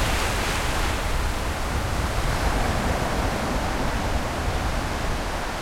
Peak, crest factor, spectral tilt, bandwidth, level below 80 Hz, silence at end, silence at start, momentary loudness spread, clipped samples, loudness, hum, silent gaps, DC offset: -10 dBFS; 14 dB; -4.5 dB/octave; 16.5 kHz; -28 dBFS; 0 s; 0 s; 3 LU; under 0.1%; -26 LUFS; none; none; under 0.1%